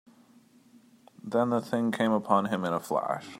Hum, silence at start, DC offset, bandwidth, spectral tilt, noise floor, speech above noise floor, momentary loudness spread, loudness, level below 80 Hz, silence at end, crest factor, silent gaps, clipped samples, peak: none; 1.25 s; under 0.1%; 16 kHz; -6.5 dB/octave; -59 dBFS; 32 dB; 5 LU; -28 LUFS; -76 dBFS; 0 s; 22 dB; none; under 0.1%; -8 dBFS